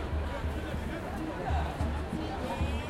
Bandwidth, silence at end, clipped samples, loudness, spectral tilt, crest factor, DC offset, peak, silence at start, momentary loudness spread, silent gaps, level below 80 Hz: 13.5 kHz; 0 s; under 0.1%; -35 LUFS; -6.5 dB/octave; 14 dB; under 0.1%; -20 dBFS; 0 s; 4 LU; none; -38 dBFS